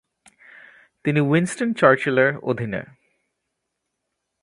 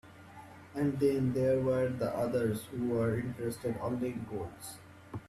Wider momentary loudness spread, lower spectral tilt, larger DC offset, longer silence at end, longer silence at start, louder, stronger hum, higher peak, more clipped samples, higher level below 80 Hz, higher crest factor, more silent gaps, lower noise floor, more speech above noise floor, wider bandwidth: second, 11 LU vs 18 LU; about the same, -6.5 dB/octave vs -7.5 dB/octave; neither; first, 1.6 s vs 0 s; first, 1.05 s vs 0.05 s; first, -20 LUFS vs -33 LUFS; neither; first, 0 dBFS vs -18 dBFS; neither; about the same, -62 dBFS vs -62 dBFS; first, 22 dB vs 16 dB; neither; first, -79 dBFS vs -52 dBFS; first, 59 dB vs 20 dB; second, 11.5 kHz vs 14 kHz